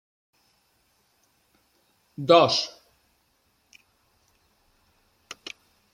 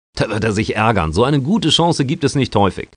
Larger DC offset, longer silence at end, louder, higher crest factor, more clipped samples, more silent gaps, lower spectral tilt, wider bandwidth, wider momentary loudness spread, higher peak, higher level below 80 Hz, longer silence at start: neither; first, 0.6 s vs 0.15 s; second, -21 LUFS vs -16 LUFS; first, 26 dB vs 16 dB; neither; neither; second, -4 dB/octave vs -5.5 dB/octave; first, 13 kHz vs 10 kHz; first, 28 LU vs 4 LU; about the same, -2 dBFS vs 0 dBFS; second, -72 dBFS vs -38 dBFS; first, 2.2 s vs 0.15 s